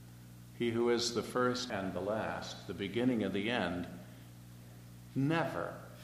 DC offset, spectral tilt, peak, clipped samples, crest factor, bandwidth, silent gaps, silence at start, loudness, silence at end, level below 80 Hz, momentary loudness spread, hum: under 0.1%; -5 dB/octave; -18 dBFS; under 0.1%; 18 dB; 15.5 kHz; none; 0 s; -35 LUFS; 0 s; -66 dBFS; 21 LU; 60 Hz at -55 dBFS